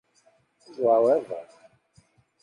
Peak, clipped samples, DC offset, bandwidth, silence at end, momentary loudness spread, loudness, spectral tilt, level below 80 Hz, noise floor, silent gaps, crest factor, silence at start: -10 dBFS; under 0.1%; under 0.1%; 10 kHz; 1 s; 19 LU; -23 LUFS; -7 dB/octave; -76 dBFS; -64 dBFS; none; 18 dB; 0.8 s